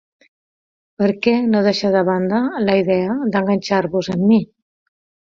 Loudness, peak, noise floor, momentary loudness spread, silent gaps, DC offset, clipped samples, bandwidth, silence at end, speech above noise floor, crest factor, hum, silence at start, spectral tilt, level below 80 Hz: -17 LUFS; -2 dBFS; under -90 dBFS; 4 LU; none; under 0.1%; under 0.1%; 7.4 kHz; 0.85 s; over 74 dB; 16 dB; none; 1 s; -7 dB/octave; -58 dBFS